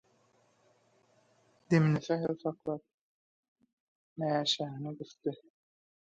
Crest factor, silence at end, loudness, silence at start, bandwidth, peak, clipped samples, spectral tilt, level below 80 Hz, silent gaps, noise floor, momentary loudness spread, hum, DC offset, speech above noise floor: 22 dB; 0.8 s; -33 LUFS; 1.7 s; 7.8 kHz; -14 dBFS; under 0.1%; -6 dB/octave; -76 dBFS; 2.94-3.56 s, 3.73-4.16 s; -70 dBFS; 15 LU; none; under 0.1%; 38 dB